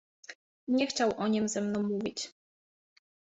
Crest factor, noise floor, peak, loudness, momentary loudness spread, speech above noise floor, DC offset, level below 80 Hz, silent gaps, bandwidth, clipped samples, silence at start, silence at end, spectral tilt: 18 dB; under -90 dBFS; -16 dBFS; -31 LUFS; 20 LU; over 60 dB; under 0.1%; -70 dBFS; 0.35-0.67 s; 8 kHz; under 0.1%; 0.3 s; 1.1 s; -4.5 dB/octave